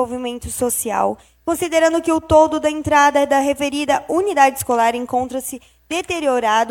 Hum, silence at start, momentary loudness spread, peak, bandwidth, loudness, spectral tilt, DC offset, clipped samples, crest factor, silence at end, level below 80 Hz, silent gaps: none; 0 s; 12 LU; 0 dBFS; 17.5 kHz; -17 LUFS; -3.5 dB/octave; under 0.1%; under 0.1%; 16 dB; 0 s; -44 dBFS; none